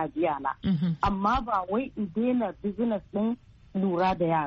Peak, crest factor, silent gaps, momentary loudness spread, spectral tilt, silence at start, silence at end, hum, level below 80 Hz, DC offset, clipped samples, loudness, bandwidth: -10 dBFS; 16 dB; none; 6 LU; -6.5 dB/octave; 0 s; 0 s; none; -48 dBFS; under 0.1%; under 0.1%; -28 LUFS; 7 kHz